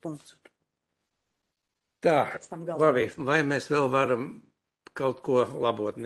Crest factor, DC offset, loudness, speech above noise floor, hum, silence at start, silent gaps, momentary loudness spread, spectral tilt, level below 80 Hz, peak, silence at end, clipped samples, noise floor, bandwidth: 22 dB; under 0.1%; -26 LUFS; 57 dB; none; 0.05 s; none; 13 LU; -6 dB/octave; -70 dBFS; -8 dBFS; 0 s; under 0.1%; -83 dBFS; 12 kHz